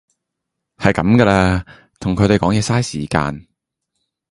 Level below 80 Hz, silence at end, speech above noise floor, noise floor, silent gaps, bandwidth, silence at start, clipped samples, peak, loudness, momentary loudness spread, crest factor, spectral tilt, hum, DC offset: -36 dBFS; 0.9 s; 63 dB; -78 dBFS; none; 11.5 kHz; 0.8 s; under 0.1%; 0 dBFS; -16 LUFS; 11 LU; 18 dB; -6 dB/octave; none; under 0.1%